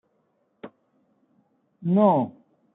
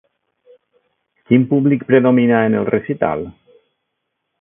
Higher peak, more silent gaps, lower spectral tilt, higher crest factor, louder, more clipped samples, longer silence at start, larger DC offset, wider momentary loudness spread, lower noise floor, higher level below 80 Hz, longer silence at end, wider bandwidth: second, -6 dBFS vs 0 dBFS; neither; about the same, -13 dB/octave vs -13 dB/octave; about the same, 20 dB vs 18 dB; second, -22 LUFS vs -15 LUFS; neither; second, 0.65 s vs 1.3 s; neither; first, 27 LU vs 8 LU; second, -70 dBFS vs -74 dBFS; second, -76 dBFS vs -54 dBFS; second, 0.45 s vs 1.1 s; about the same, 3.9 kHz vs 3.6 kHz